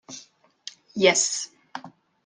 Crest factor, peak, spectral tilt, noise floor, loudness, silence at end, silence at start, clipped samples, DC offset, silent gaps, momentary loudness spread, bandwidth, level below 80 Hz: 24 dB; -2 dBFS; -1.5 dB/octave; -52 dBFS; -21 LUFS; 0.35 s; 0.1 s; under 0.1%; under 0.1%; none; 23 LU; 10.5 kHz; -74 dBFS